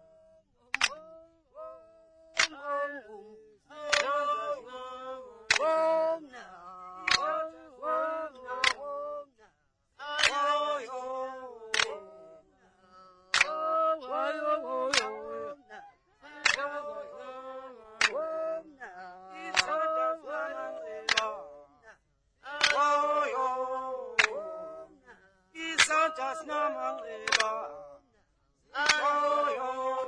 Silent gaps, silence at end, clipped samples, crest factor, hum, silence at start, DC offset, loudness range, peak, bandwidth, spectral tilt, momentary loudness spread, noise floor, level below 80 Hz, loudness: none; 0 s; under 0.1%; 24 dB; none; 0.75 s; under 0.1%; 4 LU; -8 dBFS; 10.5 kHz; 0 dB/octave; 20 LU; -73 dBFS; -68 dBFS; -30 LUFS